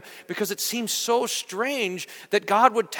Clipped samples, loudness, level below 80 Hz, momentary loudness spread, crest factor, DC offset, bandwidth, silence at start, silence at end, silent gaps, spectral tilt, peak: under 0.1%; -24 LUFS; -80 dBFS; 10 LU; 22 dB; under 0.1%; 19 kHz; 0.05 s; 0 s; none; -2 dB/octave; -2 dBFS